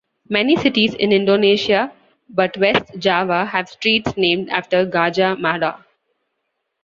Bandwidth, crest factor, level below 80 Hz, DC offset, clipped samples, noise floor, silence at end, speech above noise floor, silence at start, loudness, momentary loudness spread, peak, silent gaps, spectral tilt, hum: 7.4 kHz; 16 dB; -56 dBFS; under 0.1%; under 0.1%; -74 dBFS; 1.1 s; 57 dB; 0.3 s; -17 LUFS; 6 LU; -2 dBFS; none; -5.5 dB/octave; none